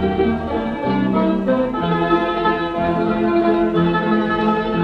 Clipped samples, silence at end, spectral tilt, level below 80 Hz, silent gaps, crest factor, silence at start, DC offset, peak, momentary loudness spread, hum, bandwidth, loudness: under 0.1%; 0 s; -8.5 dB/octave; -40 dBFS; none; 14 dB; 0 s; under 0.1%; -4 dBFS; 3 LU; none; 6 kHz; -18 LUFS